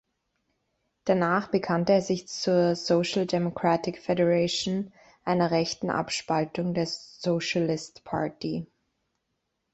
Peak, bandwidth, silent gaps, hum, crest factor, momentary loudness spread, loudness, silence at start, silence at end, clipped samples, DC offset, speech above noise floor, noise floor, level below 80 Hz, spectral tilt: -10 dBFS; 8.2 kHz; none; none; 18 dB; 10 LU; -27 LUFS; 1.05 s; 1.1 s; under 0.1%; under 0.1%; 53 dB; -79 dBFS; -64 dBFS; -5.5 dB/octave